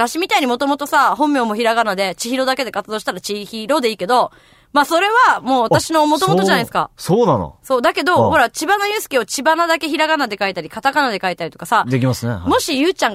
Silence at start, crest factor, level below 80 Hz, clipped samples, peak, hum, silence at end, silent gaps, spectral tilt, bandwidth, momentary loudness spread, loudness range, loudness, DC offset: 0 s; 14 dB; -50 dBFS; under 0.1%; -2 dBFS; none; 0 s; none; -4 dB/octave; 16 kHz; 7 LU; 3 LU; -16 LUFS; under 0.1%